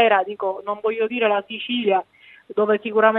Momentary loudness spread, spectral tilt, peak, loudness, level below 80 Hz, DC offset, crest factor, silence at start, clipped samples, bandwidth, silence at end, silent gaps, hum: 8 LU; -7.5 dB/octave; -2 dBFS; -22 LUFS; -76 dBFS; under 0.1%; 18 dB; 0 s; under 0.1%; 4 kHz; 0 s; none; none